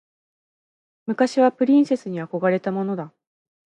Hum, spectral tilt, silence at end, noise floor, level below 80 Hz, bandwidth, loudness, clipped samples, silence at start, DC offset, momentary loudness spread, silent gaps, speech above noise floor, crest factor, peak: none; -7 dB/octave; 0.7 s; under -90 dBFS; -76 dBFS; 9.4 kHz; -21 LUFS; under 0.1%; 1.05 s; under 0.1%; 13 LU; none; over 70 dB; 18 dB; -6 dBFS